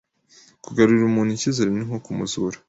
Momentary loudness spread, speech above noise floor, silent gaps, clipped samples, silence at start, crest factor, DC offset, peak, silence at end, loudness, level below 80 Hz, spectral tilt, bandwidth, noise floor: 11 LU; 33 dB; none; under 0.1%; 0.7 s; 18 dB; under 0.1%; -4 dBFS; 0.15 s; -21 LUFS; -56 dBFS; -5.5 dB/octave; 8 kHz; -54 dBFS